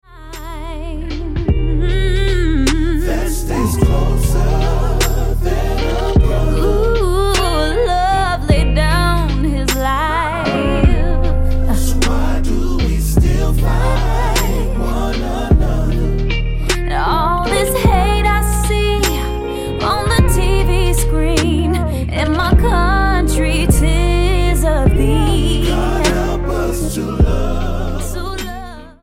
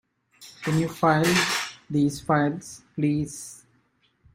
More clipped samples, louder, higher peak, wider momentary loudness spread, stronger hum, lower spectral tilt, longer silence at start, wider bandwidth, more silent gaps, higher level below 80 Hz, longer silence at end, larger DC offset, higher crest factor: neither; first, -16 LUFS vs -24 LUFS; first, 0 dBFS vs -6 dBFS; second, 6 LU vs 16 LU; neither; about the same, -5.5 dB/octave vs -5 dB/octave; second, 0.1 s vs 0.4 s; about the same, 16 kHz vs 16 kHz; neither; first, -16 dBFS vs -58 dBFS; second, 0.1 s vs 0.8 s; neither; second, 14 dB vs 20 dB